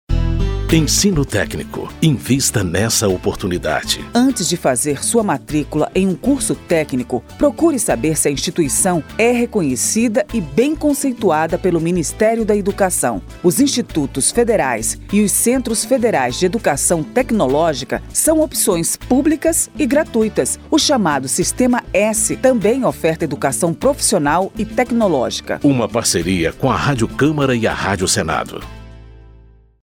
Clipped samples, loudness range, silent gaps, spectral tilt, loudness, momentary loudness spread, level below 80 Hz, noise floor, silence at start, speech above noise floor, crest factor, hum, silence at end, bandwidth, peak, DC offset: under 0.1%; 2 LU; none; -4 dB/octave; -16 LUFS; 5 LU; -32 dBFS; -45 dBFS; 0.1 s; 29 dB; 16 dB; none; 0.55 s; 19 kHz; 0 dBFS; under 0.1%